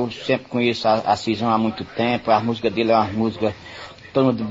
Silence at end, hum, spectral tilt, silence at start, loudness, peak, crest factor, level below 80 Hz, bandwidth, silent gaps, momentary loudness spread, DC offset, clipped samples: 0 s; none; -6.5 dB/octave; 0 s; -21 LUFS; -4 dBFS; 16 dB; -54 dBFS; 8 kHz; none; 7 LU; under 0.1%; under 0.1%